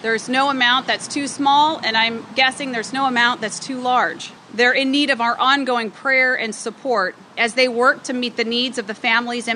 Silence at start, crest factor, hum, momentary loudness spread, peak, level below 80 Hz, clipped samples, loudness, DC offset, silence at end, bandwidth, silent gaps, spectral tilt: 0 s; 16 dB; none; 9 LU; -2 dBFS; -76 dBFS; under 0.1%; -18 LUFS; under 0.1%; 0 s; 11 kHz; none; -2 dB/octave